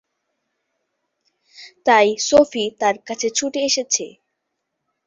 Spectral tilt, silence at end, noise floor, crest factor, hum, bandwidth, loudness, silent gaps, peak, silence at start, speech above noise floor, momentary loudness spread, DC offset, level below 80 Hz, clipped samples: -1.5 dB/octave; 1 s; -77 dBFS; 20 dB; none; 8 kHz; -18 LUFS; none; -2 dBFS; 1.6 s; 59 dB; 8 LU; under 0.1%; -60 dBFS; under 0.1%